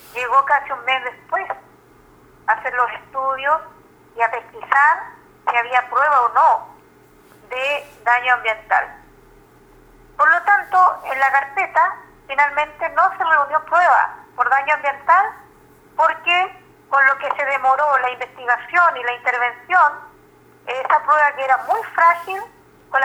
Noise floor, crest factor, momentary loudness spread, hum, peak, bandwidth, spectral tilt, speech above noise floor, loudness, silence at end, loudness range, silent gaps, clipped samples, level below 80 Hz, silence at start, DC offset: -49 dBFS; 18 dB; 11 LU; none; -2 dBFS; over 20 kHz; -2 dB/octave; 32 dB; -17 LUFS; 0 s; 5 LU; none; under 0.1%; -60 dBFS; 0.15 s; under 0.1%